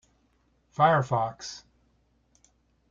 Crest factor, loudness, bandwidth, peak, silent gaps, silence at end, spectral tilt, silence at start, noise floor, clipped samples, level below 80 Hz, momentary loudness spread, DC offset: 22 dB; -25 LUFS; 7.6 kHz; -8 dBFS; none; 1.35 s; -5.5 dB/octave; 0.8 s; -68 dBFS; under 0.1%; -64 dBFS; 20 LU; under 0.1%